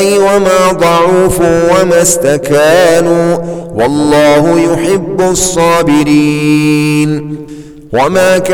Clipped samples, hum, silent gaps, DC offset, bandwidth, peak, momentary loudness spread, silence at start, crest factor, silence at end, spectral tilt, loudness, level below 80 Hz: under 0.1%; none; none; under 0.1%; 19 kHz; 0 dBFS; 7 LU; 0 s; 8 dB; 0 s; -4.5 dB/octave; -8 LUFS; -34 dBFS